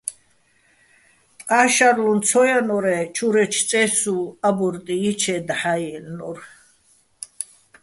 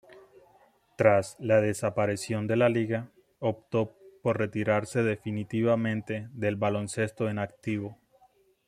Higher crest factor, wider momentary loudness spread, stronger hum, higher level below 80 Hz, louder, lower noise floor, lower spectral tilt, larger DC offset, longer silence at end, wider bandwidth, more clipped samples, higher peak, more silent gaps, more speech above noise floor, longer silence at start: about the same, 20 dB vs 22 dB; first, 17 LU vs 9 LU; neither; about the same, -64 dBFS vs -66 dBFS; first, -19 LUFS vs -28 LUFS; second, -60 dBFS vs -64 dBFS; second, -3 dB/octave vs -6.5 dB/octave; neither; second, 0.4 s vs 0.75 s; second, 12 kHz vs 14 kHz; neither; first, -2 dBFS vs -6 dBFS; neither; first, 41 dB vs 36 dB; about the same, 0.05 s vs 0.1 s